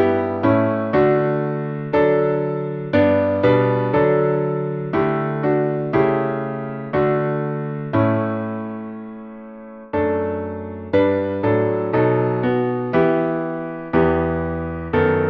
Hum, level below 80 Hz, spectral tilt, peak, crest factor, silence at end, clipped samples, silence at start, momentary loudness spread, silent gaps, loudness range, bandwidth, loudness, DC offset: none; -46 dBFS; -10.5 dB/octave; -2 dBFS; 16 dB; 0 s; under 0.1%; 0 s; 10 LU; none; 5 LU; 5.4 kHz; -20 LUFS; under 0.1%